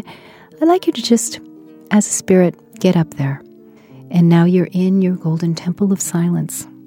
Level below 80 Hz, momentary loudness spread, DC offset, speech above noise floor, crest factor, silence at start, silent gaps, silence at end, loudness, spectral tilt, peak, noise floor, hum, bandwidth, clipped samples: -60 dBFS; 10 LU; under 0.1%; 28 dB; 16 dB; 0.05 s; none; 0.2 s; -16 LUFS; -6 dB/octave; 0 dBFS; -42 dBFS; none; 16 kHz; under 0.1%